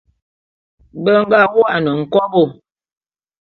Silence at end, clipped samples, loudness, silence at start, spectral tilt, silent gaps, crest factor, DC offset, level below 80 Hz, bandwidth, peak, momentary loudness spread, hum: 0.9 s; under 0.1%; -14 LUFS; 0.95 s; -8.5 dB/octave; none; 16 dB; under 0.1%; -56 dBFS; 5.8 kHz; 0 dBFS; 7 LU; none